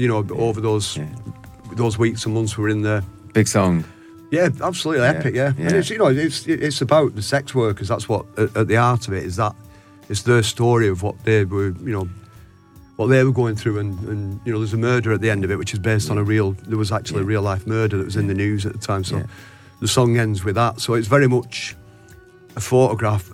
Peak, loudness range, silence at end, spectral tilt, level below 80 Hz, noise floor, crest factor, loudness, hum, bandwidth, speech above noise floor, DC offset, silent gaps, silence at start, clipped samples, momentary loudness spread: -2 dBFS; 3 LU; 0 s; -6 dB/octave; -50 dBFS; -47 dBFS; 18 dB; -20 LUFS; none; 15 kHz; 28 dB; under 0.1%; none; 0 s; under 0.1%; 9 LU